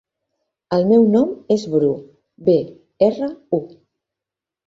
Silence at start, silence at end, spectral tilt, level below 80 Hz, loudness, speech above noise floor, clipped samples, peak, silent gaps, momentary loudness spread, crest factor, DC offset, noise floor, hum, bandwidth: 0.7 s; 1 s; -8 dB/octave; -60 dBFS; -18 LUFS; 70 dB; under 0.1%; -2 dBFS; none; 11 LU; 16 dB; under 0.1%; -87 dBFS; none; 7.6 kHz